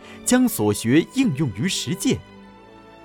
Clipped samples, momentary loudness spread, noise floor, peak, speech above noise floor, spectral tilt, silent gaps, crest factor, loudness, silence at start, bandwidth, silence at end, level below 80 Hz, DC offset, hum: under 0.1%; 5 LU; -45 dBFS; -4 dBFS; 25 dB; -4.5 dB/octave; none; 18 dB; -21 LUFS; 0 s; 19 kHz; 0.25 s; -54 dBFS; under 0.1%; none